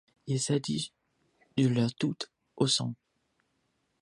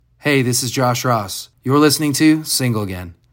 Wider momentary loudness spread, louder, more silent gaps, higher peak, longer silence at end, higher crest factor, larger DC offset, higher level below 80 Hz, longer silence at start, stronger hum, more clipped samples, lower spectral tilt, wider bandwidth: about the same, 13 LU vs 12 LU; second, -31 LUFS vs -16 LUFS; neither; second, -12 dBFS vs 0 dBFS; first, 1.05 s vs 0.2 s; about the same, 20 dB vs 16 dB; neither; second, -70 dBFS vs -54 dBFS; about the same, 0.25 s vs 0.25 s; neither; neither; about the same, -5 dB/octave vs -4.5 dB/octave; second, 11.5 kHz vs 16.5 kHz